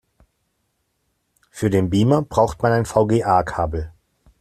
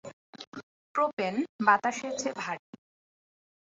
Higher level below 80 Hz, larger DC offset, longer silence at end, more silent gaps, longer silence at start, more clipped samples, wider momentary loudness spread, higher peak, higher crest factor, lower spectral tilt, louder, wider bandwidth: first, -42 dBFS vs -78 dBFS; neither; second, 0.5 s vs 1.1 s; second, none vs 0.13-0.33 s, 0.47-0.52 s, 0.63-0.95 s, 1.13-1.17 s, 1.49-1.59 s; first, 1.55 s vs 0.05 s; neither; second, 8 LU vs 22 LU; first, -2 dBFS vs -8 dBFS; second, 18 dB vs 24 dB; first, -7 dB/octave vs -3.5 dB/octave; first, -19 LUFS vs -29 LUFS; first, 14 kHz vs 8.2 kHz